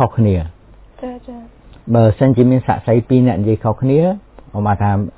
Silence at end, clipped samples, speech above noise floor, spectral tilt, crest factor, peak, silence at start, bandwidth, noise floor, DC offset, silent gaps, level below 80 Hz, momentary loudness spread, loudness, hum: 0.05 s; under 0.1%; 25 dB; -13 dB/octave; 14 dB; 0 dBFS; 0 s; 4 kHz; -39 dBFS; under 0.1%; none; -34 dBFS; 18 LU; -14 LUFS; none